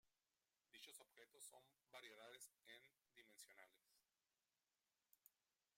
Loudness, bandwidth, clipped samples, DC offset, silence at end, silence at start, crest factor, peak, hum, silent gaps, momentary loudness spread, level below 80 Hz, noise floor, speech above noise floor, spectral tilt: -64 LUFS; 16 kHz; under 0.1%; under 0.1%; 0.45 s; 0.05 s; 24 dB; -46 dBFS; none; none; 7 LU; under -90 dBFS; under -90 dBFS; over 24 dB; 0 dB/octave